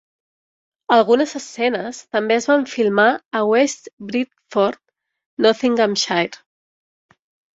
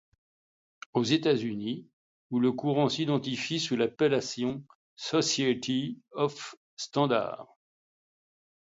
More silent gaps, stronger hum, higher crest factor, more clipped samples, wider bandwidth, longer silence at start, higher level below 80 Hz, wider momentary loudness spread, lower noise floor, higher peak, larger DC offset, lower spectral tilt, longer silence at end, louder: second, 3.26-3.31 s, 3.93-3.97 s, 5.26-5.37 s vs 1.93-2.30 s, 4.75-4.97 s, 6.57-6.77 s; neither; about the same, 18 dB vs 20 dB; neither; about the same, 8 kHz vs 7.8 kHz; about the same, 0.9 s vs 0.95 s; first, -66 dBFS vs -72 dBFS; second, 10 LU vs 13 LU; about the same, under -90 dBFS vs under -90 dBFS; first, -2 dBFS vs -12 dBFS; neither; second, -3.5 dB/octave vs -5 dB/octave; about the same, 1.25 s vs 1.2 s; first, -18 LUFS vs -29 LUFS